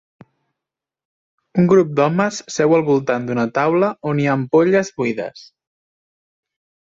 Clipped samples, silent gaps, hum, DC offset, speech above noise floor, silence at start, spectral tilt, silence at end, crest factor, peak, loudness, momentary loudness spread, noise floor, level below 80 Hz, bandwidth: under 0.1%; none; none; under 0.1%; 69 dB; 1.55 s; -6.5 dB/octave; 1.45 s; 16 dB; -2 dBFS; -17 LUFS; 8 LU; -85 dBFS; -60 dBFS; 7.8 kHz